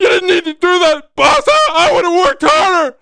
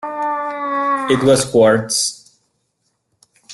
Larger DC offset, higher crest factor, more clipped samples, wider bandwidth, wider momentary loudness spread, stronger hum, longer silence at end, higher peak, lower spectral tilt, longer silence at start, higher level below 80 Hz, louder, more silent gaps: neither; second, 10 dB vs 16 dB; neither; second, 10.5 kHz vs 12.5 kHz; second, 4 LU vs 9 LU; neither; about the same, 0.1 s vs 0 s; about the same, 0 dBFS vs -2 dBFS; second, -2.5 dB/octave vs -4 dB/octave; about the same, 0 s vs 0 s; first, -42 dBFS vs -56 dBFS; first, -11 LUFS vs -16 LUFS; neither